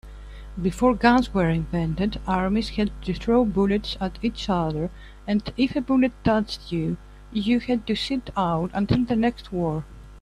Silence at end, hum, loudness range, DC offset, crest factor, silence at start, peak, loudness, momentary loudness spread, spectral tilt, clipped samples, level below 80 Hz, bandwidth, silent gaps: 0 s; 50 Hz at -40 dBFS; 2 LU; under 0.1%; 20 dB; 0.05 s; -4 dBFS; -24 LUFS; 10 LU; -7 dB/octave; under 0.1%; -40 dBFS; 11.5 kHz; none